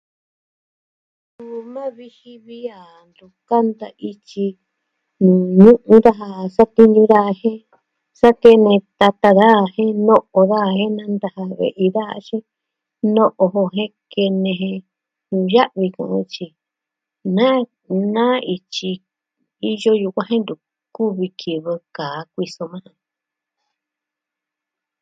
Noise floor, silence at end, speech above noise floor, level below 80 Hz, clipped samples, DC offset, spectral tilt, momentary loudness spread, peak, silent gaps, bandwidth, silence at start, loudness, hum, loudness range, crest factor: -84 dBFS; 2.2 s; 69 dB; -58 dBFS; 0.3%; under 0.1%; -7.5 dB/octave; 19 LU; 0 dBFS; none; 7.8 kHz; 1.4 s; -16 LUFS; none; 14 LU; 18 dB